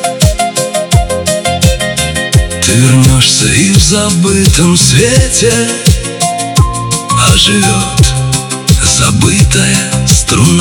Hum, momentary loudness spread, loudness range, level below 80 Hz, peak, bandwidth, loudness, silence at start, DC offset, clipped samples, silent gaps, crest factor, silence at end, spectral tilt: none; 6 LU; 2 LU; -18 dBFS; 0 dBFS; over 20 kHz; -8 LUFS; 0 s; under 0.1%; 1%; none; 8 dB; 0 s; -4 dB/octave